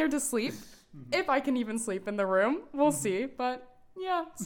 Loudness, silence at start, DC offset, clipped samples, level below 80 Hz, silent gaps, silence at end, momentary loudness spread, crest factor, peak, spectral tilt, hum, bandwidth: -30 LUFS; 0 s; under 0.1%; under 0.1%; -64 dBFS; none; 0 s; 8 LU; 16 dB; -14 dBFS; -4 dB/octave; none; 19 kHz